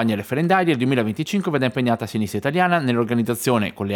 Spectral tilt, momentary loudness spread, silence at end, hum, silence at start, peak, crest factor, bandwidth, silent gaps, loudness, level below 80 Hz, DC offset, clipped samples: -6 dB/octave; 5 LU; 0 s; none; 0 s; -4 dBFS; 16 dB; 19 kHz; none; -20 LUFS; -64 dBFS; under 0.1%; under 0.1%